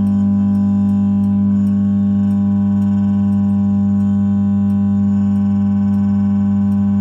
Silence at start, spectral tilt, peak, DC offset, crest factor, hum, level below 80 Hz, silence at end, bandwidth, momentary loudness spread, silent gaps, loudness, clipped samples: 0 s; -11 dB/octave; -8 dBFS; under 0.1%; 6 dB; none; -48 dBFS; 0 s; 3.1 kHz; 1 LU; none; -15 LUFS; under 0.1%